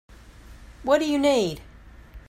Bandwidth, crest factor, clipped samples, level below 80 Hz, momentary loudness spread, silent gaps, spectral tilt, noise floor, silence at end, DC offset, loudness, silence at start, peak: 16 kHz; 18 dB; under 0.1%; -48 dBFS; 14 LU; none; -4.5 dB/octave; -46 dBFS; 0.1 s; under 0.1%; -23 LUFS; 0.45 s; -6 dBFS